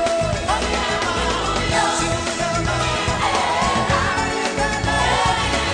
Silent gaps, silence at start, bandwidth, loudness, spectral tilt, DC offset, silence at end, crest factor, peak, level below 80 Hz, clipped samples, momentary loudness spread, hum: none; 0 s; 10 kHz; -19 LUFS; -3.5 dB/octave; under 0.1%; 0 s; 12 dB; -6 dBFS; -32 dBFS; under 0.1%; 3 LU; none